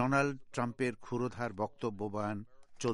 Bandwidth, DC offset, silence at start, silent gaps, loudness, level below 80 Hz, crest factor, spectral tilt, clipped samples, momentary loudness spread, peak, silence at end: 11.5 kHz; under 0.1%; 0 s; none; -37 LUFS; -66 dBFS; 18 dB; -6 dB/octave; under 0.1%; 7 LU; -16 dBFS; 0 s